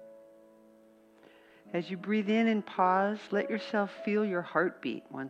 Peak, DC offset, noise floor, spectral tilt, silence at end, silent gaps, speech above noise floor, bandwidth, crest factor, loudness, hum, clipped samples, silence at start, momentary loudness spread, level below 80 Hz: -12 dBFS; under 0.1%; -60 dBFS; -7 dB/octave; 0 s; none; 29 dB; 7.8 kHz; 20 dB; -31 LUFS; none; under 0.1%; 0 s; 10 LU; -82 dBFS